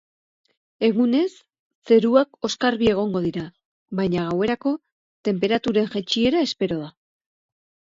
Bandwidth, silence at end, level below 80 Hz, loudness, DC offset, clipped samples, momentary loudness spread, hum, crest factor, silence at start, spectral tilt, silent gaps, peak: 7.8 kHz; 0.95 s; -56 dBFS; -22 LUFS; under 0.1%; under 0.1%; 11 LU; none; 20 dB; 0.8 s; -6 dB/octave; 1.59-1.82 s, 3.65-3.86 s, 4.92-5.24 s; -4 dBFS